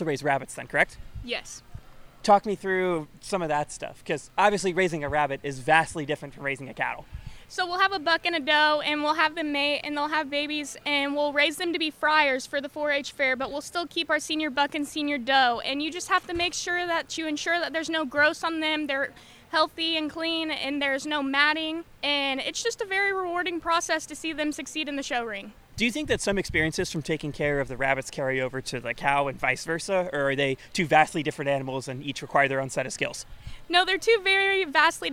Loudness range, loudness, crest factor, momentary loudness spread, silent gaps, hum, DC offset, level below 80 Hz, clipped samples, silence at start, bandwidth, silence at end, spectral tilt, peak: 3 LU; -26 LUFS; 22 dB; 10 LU; none; none; under 0.1%; -52 dBFS; under 0.1%; 0 s; 16.5 kHz; 0 s; -3.5 dB/octave; -4 dBFS